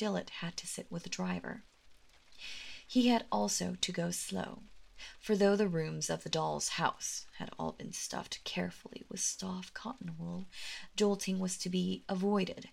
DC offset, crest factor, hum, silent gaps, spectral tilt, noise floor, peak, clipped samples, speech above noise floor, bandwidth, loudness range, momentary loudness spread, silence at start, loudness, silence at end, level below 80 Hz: under 0.1%; 20 dB; none; none; -4 dB/octave; -60 dBFS; -16 dBFS; under 0.1%; 24 dB; 16 kHz; 5 LU; 15 LU; 0 s; -36 LUFS; 0 s; -66 dBFS